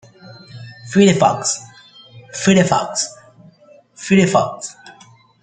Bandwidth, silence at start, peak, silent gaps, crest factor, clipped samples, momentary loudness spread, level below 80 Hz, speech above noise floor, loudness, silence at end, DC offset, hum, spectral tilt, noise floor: 9.4 kHz; 0.25 s; -2 dBFS; none; 18 dB; under 0.1%; 21 LU; -56 dBFS; 33 dB; -16 LUFS; 0.5 s; under 0.1%; none; -4.5 dB/octave; -48 dBFS